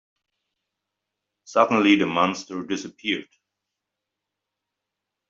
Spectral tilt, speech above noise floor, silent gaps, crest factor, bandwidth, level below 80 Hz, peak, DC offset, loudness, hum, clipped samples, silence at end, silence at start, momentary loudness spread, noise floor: -4.5 dB/octave; 62 dB; none; 24 dB; 7.6 kHz; -70 dBFS; -4 dBFS; under 0.1%; -22 LUFS; none; under 0.1%; 2.05 s; 1.5 s; 12 LU; -84 dBFS